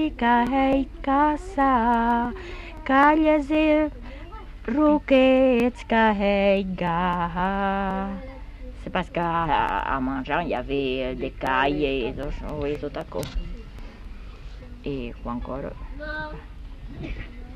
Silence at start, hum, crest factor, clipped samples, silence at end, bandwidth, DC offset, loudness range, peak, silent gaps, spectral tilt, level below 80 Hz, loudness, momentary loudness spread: 0 s; none; 18 dB; under 0.1%; 0 s; 13.5 kHz; under 0.1%; 14 LU; -6 dBFS; none; -7 dB/octave; -38 dBFS; -23 LUFS; 22 LU